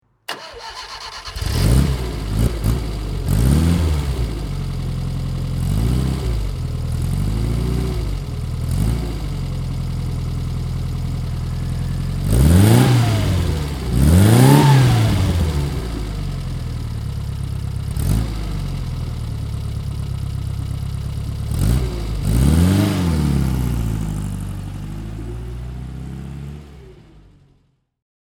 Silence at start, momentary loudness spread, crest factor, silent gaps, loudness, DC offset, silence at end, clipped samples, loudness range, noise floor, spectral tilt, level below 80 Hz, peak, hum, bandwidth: 0.3 s; 16 LU; 18 dB; none; -20 LUFS; under 0.1%; 1.05 s; under 0.1%; 10 LU; -60 dBFS; -6.5 dB/octave; -24 dBFS; 0 dBFS; none; 18 kHz